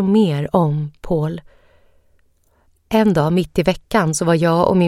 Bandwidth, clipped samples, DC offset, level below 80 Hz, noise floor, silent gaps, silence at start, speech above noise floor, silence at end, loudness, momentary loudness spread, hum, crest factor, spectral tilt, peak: 15 kHz; under 0.1%; under 0.1%; -42 dBFS; -58 dBFS; none; 0 s; 42 dB; 0 s; -17 LUFS; 7 LU; none; 18 dB; -6.5 dB/octave; 0 dBFS